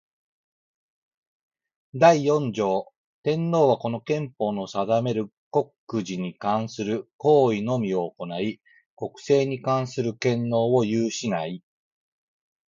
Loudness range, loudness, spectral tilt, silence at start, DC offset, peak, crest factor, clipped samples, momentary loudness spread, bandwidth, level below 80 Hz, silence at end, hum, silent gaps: 3 LU; -24 LUFS; -6.5 dB/octave; 1.95 s; under 0.1%; -4 dBFS; 22 dB; under 0.1%; 12 LU; 7.6 kHz; -68 dBFS; 1.1 s; none; 2.97-3.23 s, 5.33-5.51 s, 5.78-5.87 s, 7.13-7.19 s, 8.86-8.97 s